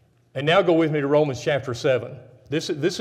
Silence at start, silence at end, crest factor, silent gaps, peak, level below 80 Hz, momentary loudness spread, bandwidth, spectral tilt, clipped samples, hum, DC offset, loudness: 0.35 s; 0 s; 16 dB; none; -6 dBFS; -62 dBFS; 10 LU; 14 kHz; -5.5 dB/octave; under 0.1%; none; under 0.1%; -22 LUFS